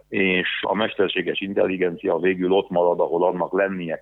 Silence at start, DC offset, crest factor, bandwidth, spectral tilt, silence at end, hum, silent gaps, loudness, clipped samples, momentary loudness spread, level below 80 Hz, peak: 0.1 s; under 0.1%; 16 dB; 4.1 kHz; -8.5 dB/octave; 0 s; none; none; -22 LUFS; under 0.1%; 4 LU; -62 dBFS; -6 dBFS